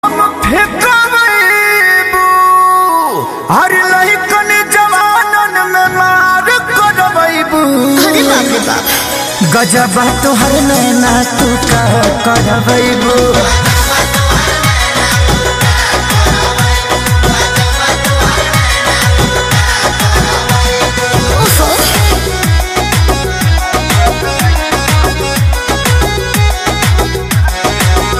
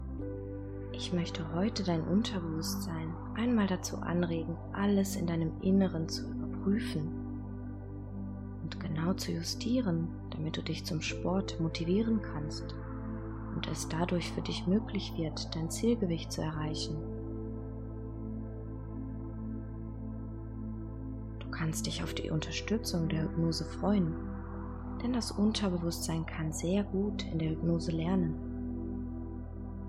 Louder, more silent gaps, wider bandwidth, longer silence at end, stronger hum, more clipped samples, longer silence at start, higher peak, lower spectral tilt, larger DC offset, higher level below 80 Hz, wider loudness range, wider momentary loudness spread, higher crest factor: first, -9 LUFS vs -35 LUFS; neither; about the same, 16 kHz vs 15 kHz; about the same, 0 s vs 0 s; neither; neither; about the same, 0.05 s vs 0 s; first, 0 dBFS vs -16 dBFS; second, -3.5 dB/octave vs -6 dB/octave; neither; first, -18 dBFS vs -46 dBFS; second, 3 LU vs 7 LU; second, 4 LU vs 11 LU; second, 10 dB vs 18 dB